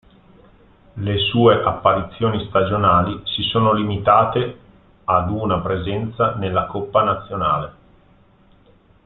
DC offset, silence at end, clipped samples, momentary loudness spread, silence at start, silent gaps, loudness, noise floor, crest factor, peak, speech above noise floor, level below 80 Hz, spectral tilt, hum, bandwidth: under 0.1%; 1.35 s; under 0.1%; 9 LU; 0.95 s; none; -19 LUFS; -53 dBFS; 18 dB; -2 dBFS; 34 dB; -46 dBFS; -11 dB/octave; none; 4.2 kHz